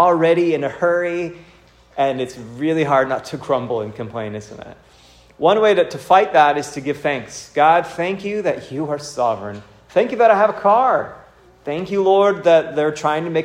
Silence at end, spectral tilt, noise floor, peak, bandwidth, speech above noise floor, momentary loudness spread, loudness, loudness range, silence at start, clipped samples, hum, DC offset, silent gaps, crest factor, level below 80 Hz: 0 s; -5.5 dB/octave; -48 dBFS; 0 dBFS; 14.5 kHz; 31 dB; 14 LU; -18 LUFS; 5 LU; 0 s; under 0.1%; none; under 0.1%; none; 18 dB; -56 dBFS